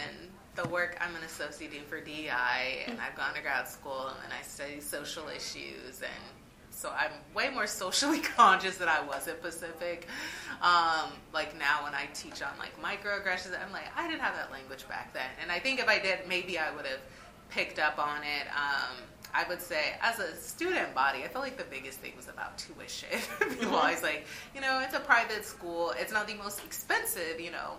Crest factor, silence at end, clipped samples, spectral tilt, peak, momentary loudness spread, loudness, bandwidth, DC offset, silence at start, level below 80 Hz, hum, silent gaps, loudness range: 26 dB; 0 s; under 0.1%; -2 dB/octave; -8 dBFS; 14 LU; -32 LUFS; 15.5 kHz; under 0.1%; 0 s; -62 dBFS; none; none; 7 LU